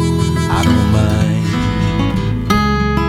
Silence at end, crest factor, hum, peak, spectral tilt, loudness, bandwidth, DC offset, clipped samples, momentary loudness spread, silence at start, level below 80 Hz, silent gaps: 0 s; 14 dB; none; 0 dBFS; -6.5 dB/octave; -15 LUFS; 15.5 kHz; under 0.1%; under 0.1%; 4 LU; 0 s; -24 dBFS; none